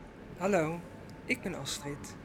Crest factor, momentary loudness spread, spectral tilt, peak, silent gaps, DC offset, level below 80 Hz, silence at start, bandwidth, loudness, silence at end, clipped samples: 20 dB; 17 LU; -4.5 dB/octave; -16 dBFS; none; under 0.1%; -58 dBFS; 0 s; 19 kHz; -34 LUFS; 0 s; under 0.1%